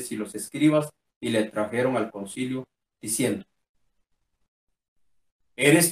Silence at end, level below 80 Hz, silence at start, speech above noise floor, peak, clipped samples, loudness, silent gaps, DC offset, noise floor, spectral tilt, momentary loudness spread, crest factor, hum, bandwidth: 0 s; -70 dBFS; 0 s; 48 dB; -6 dBFS; under 0.1%; -26 LUFS; 1.16-1.21 s, 3.69-3.74 s, 4.48-4.67 s, 4.88-4.96 s, 5.32-5.39 s; under 0.1%; -72 dBFS; -4 dB/octave; 13 LU; 22 dB; none; 15.5 kHz